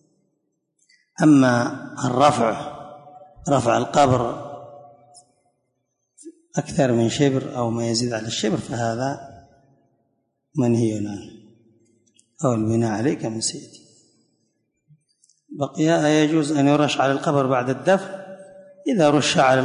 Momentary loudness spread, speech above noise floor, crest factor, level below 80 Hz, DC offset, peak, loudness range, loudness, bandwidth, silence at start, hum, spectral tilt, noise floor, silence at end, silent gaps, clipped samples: 17 LU; 55 dB; 18 dB; -56 dBFS; under 0.1%; -4 dBFS; 7 LU; -20 LUFS; 11 kHz; 1.2 s; none; -5.5 dB/octave; -74 dBFS; 0 s; none; under 0.1%